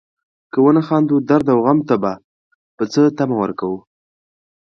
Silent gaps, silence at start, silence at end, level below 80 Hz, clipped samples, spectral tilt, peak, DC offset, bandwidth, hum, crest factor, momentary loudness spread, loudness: 2.24-2.78 s; 0.55 s; 0.9 s; -58 dBFS; under 0.1%; -8 dB/octave; 0 dBFS; under 0.1%; 7 kHz; none; 16 dB; 11 LU; -16 LUFS